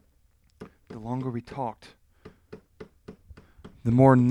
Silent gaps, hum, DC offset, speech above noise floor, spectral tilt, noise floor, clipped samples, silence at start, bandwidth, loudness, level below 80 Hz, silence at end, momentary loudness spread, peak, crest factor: none; none; under 0.1%; 41 dB; -10 dB/octave; -64 dBFS; under 0.1%; 0.6 s; 10 kHz; -25 LUFS; -54 dBFS; 0 s; 30 LU; -6 dBFS; 22 dB